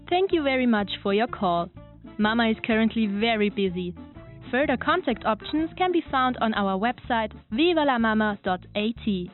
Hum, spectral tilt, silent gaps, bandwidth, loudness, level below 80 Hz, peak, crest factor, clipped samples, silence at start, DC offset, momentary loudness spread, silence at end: none; -3.5 dB/octave; none; 4.2 kHz; -24 LUFS; -50 dBFS; -8 dBFS; 16 dB; under 0.1%; 0 s; under 0.1%; 7 LU; 0.05 s